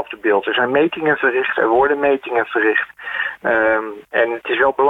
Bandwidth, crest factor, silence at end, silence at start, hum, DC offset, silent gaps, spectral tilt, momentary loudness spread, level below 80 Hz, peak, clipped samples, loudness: 4 kHz; 14 dB; 0 s; 0 s; none; under 0.1%; none; -6.5 dB/octave; 6 LU; -54 dBFS; -4 dBFS; under 0.1%; -17 LUFS